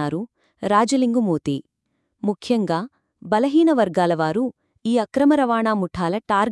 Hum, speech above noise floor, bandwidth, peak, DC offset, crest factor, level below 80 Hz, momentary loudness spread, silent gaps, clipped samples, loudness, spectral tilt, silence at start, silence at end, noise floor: none; 54 dB; 12 kHz; -4 dBFS; under 0.1%; 16 dB; -58 dBFS; 12 LU; none; under 0.1%; -21 LUFS; -6 dB/octave; 0 s; 0 s; -73 dBFS